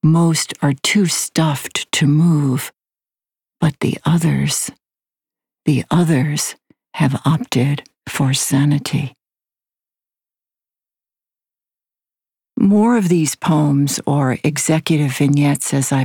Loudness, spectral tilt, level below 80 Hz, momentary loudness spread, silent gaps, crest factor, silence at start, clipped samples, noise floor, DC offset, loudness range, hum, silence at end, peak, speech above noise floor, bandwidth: -17 LUFS; -5 dB/octave; -56 dBFS; 8 LU; none; 14 dB; 0.05 s; under 0.1%; under -90 dBFS; under 0.1%; 5 LU; none; 0 s; -4 dBFS; over 74 dB; 19 kHz